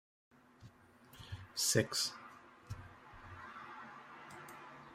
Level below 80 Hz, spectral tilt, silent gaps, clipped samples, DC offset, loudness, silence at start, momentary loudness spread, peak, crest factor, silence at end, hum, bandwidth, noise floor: -68 dBFS; -2.5 dB/octave; none; under 0.1%; under 0.1%; -37 LUFS; 0.35 s; 27 LU; -16 dBFS; 26 dB; 0 s; none; 16 kHz; -62 dBFS